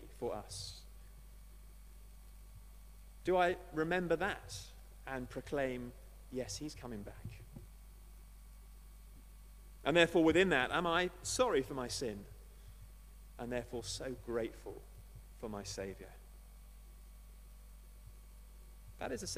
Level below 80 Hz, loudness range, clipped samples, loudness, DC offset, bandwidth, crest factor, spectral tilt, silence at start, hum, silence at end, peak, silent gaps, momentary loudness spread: -56 dBFS; 17 LU; under 0.1%; -37 LUFS; under 0.1%; 15 kHz; 26 dB; -4 dB/octave; 0 s; 50 Hz at -55 dBFS; 0 s; -14 dBFS; none; 26 LU